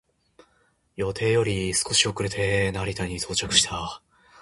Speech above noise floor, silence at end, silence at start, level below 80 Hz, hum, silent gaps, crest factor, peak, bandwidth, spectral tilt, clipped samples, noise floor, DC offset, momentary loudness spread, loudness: 41 dB; 0 s; 1 s; -46 dBFS; none; none; 24 dB; -2 dBFS; 11.5 kHz; -3 dB/octave; under 0.1%; -66 dBFS; under 0.1%; 12 LU; -24 LUFS